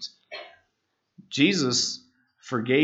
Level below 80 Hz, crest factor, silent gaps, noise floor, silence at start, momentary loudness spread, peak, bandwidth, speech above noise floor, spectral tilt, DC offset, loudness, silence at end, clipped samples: -78 dBFS; 22 dB; none; -77 dBFS; 0 s; 20 LU; -6 dBFS; 8.2 kHz; 54 dB; -3.5 dB/octave; under 0.1%; -24 LUFS; 0 s; under 0.1%